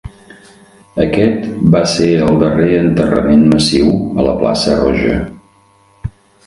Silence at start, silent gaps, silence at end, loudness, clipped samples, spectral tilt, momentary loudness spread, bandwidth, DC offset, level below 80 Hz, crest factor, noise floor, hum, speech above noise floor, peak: 0.05 s; none; 0.4 s; -12 LUFS; under 0.1%; -6 dB/octave; 15 LU; 11.5 kHz; under 0.1%; -32 dBFS; 12 dB; -49 dBFS; none; 38 dB; 0 dBFS